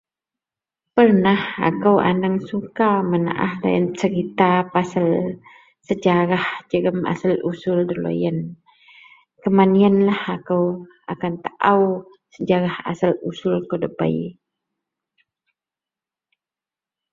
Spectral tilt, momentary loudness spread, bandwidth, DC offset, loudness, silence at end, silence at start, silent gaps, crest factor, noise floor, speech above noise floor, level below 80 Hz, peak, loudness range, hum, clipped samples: -8 dB/octave; 12 LU; 7.6 kHz; under 0.1%; -20 LUFS; 2.8 s; 0.95 s; none; 18 dB; -90 dBFS; 71 dB; -60 dBFS; -2 dBFS; 7 LU; none; under 0.1%